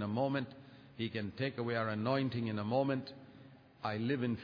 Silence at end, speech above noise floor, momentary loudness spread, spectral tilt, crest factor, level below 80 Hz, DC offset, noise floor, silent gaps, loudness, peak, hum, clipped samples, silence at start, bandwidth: 0 s; 22 dB; 17 LU; -5.5 dB/octave; 16 dB; -74 dBFS; under 0.1%; -58 dBFS; none; -37 LUFS; -20 dBFS; none; under 0.1%; 0 s; 5.2 kHz